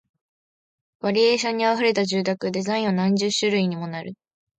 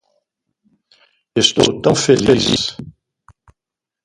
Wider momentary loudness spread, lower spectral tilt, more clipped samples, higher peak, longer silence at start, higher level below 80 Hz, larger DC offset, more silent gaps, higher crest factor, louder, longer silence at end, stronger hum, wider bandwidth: about the same, 11 LU vs 11 LU; about the same, -4.5 dB/octave vs -4 dB/octave; neither; second, -8 dBFS vs 0 dBFS; second, 1.05 s vs 1.35 s; second, -68 dBFS vs -46 dBFS; neither; neither; about the same, 16 dB vs 18 dB; second, -22 LUFS vs -14 LUFS; second, 0.45 s vs 1.15 s; neither; second, 9.4 kHz vs 11.5 kHz